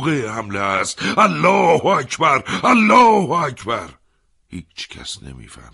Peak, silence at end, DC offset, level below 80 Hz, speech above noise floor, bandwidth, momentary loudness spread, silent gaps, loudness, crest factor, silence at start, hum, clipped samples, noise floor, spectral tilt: 0 dBFS; 0.2 s; under 0.1%; -50 dBFS; 43 dB; 11.5 kHz; 20 LU; none; -16 LUFS; 16 dB; 0 s; none; under 0.1%; -60 dBFS; -4.5 dB/octave